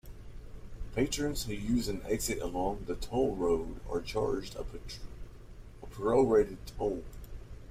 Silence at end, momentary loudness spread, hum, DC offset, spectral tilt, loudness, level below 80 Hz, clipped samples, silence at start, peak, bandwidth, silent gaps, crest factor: 0 s; 23 LU; none; under 0.1%; -5 dB/octave; -33 LUFS; -44 dBFS; under 0.1%; 0.05 s; -14 dBFS; 16 kHz; none; 18 dB